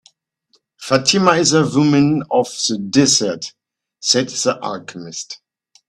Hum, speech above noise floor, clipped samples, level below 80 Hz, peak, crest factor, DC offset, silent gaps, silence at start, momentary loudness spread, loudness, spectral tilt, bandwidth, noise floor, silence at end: none; 46 dB; under 0.1%; -56 dBFS; 0 dBFS; 18 dB; under 0.1%; none; 0.8 s; 16 LU; -15 LUFS; -3.5 dB/octave; 12.5 kHz; -62 dBFS; 0.5 s